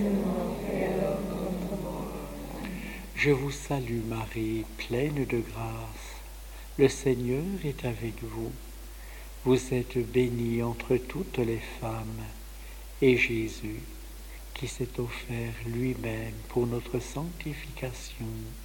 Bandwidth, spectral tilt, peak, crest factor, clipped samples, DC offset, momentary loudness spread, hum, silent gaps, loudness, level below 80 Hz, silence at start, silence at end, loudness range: 17 kHz; -6 dB/octave; -8 dBFS; 22 dB; under 0.1%; under 0.1%; 17 LU; none; none; -31 LUFS; -44 dBFS; 0 s; 0 s; 4 LU